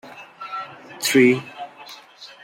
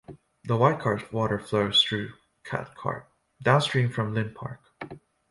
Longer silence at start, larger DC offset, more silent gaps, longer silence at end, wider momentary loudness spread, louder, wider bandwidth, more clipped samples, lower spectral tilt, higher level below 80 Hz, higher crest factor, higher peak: about the same, 0.05 s vs 0.1 s; neither; neither; second, 0.2 s vs 0.35 s; first, 24 LU vs 19 LU; first, -19 LUFS vs -26 LUFS; first, 16 kHz vs 11.5 kHz; neither; second, -4 dB/octave vs -5.5 dB/octave; second, -70 dBFS vs -58 dBFS; about the same, 20 dB vs 22 dB; about the same, -4 dBFS vs -6 dBFS